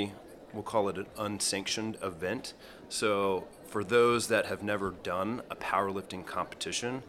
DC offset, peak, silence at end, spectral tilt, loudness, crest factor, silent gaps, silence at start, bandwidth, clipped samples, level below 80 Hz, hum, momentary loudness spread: under 0.1%; -12 dBFS; 0 s; -3.5 dB/octave; -32 LUFS; 20 dB; none; 0 s; 16 kHz; under 0.1%; -64 dBFS; none; 12 LU